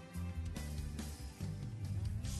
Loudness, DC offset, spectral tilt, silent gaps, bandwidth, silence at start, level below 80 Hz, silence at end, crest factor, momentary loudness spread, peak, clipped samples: -44 LUFS; under 0.1%; -5.5 dB/octave; none; 12.5 kHz; 0 s; -48 dBFS; 0 s; 12 dB; 5 LU; -30 dBFS; under 0.1%